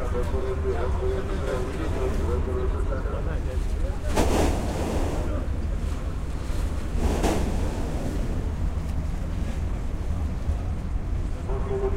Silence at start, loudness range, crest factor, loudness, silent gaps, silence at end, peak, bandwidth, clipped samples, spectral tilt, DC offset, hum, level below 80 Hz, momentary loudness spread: 0 s; 3 LU; 18 dB; -29 LUFS; none; 0 s; -8 dBFS; 15.5 kHz; under 0.1%; -6.5 dB/octave; under 0.1%; none; -28 dBFS; 6 LU